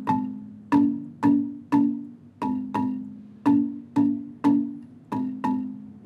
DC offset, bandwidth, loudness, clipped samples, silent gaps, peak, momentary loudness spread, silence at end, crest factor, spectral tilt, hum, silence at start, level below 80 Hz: under 0.1%; 6.2 kHz; -25 LUFS; under 0.1%; none; -8 dBFS; 13 LU; 0 s; 16 dB; -8.5 dB/octave; none; 0 s; -66 dBFS